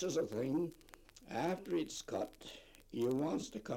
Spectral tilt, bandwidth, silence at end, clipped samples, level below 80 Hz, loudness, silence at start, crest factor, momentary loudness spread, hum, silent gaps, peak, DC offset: -5.5 dB/octave; 16.5 kHz; 0 s; under 0.1%; -66 dBFS; -40 LUFS; 0 s; 16 dB; 18 LU; none; none; -24 dBFS; under 0.1%